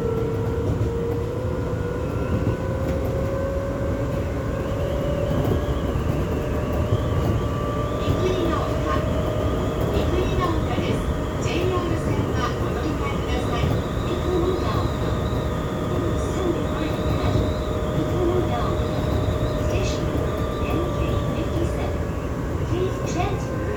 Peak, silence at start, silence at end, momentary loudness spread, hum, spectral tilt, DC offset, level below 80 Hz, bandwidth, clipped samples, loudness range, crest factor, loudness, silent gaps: -8 dBFS; 0 s; 0 s; 3 LU; none; -7 dB/octave; under 0.1%; -30 dBFS; over 20 kHz; under 0.1%; 2 LU; 14 dB; -24 LUFS; none